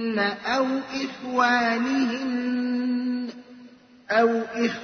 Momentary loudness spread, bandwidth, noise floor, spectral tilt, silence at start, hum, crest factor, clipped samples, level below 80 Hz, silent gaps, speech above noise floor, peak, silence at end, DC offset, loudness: 9 LU; 6.6 kHz; -49 dBFS; -4.5 dB/octave; 0 s; none; 16 dB; under 0.1%; -68 dBFS; none; 26 dB; -8 dBFS; 0 s; under 0.1%; -24 LUFS